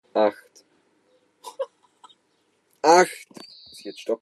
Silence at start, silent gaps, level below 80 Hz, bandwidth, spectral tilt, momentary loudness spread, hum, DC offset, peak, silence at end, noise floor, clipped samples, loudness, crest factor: 0.15 s; none; -82 dBFS; 13 kHz; -3 dB/octave; 26 LU; none; under 0.1%; -2 dBFS; 0.05 s; -68 dBFS; under 0.1%; -22 LUFS; 24 dB